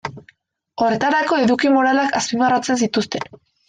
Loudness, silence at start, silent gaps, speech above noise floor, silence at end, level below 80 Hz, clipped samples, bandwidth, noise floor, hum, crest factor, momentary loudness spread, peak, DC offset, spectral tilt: -18 LUFS; 0.05 s; none; 38 dB; 0.45 s; -60 dBFS; under 0.1%; 9.6 kHz; -55 dBFS; none; 14 dB; 13 LU; -4 dBFS; under 0.1%; -4 dB/octave